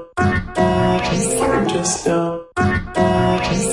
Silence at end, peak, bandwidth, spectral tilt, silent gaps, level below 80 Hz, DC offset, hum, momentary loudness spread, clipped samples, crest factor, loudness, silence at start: 0 s; -4 dBFS; 11.5 kHz; -5 dB/octave; none; -36 dBFS; under 0.1%; none; 3 LU; under 0.1%; 14 dB; -18 LUFS; 0 s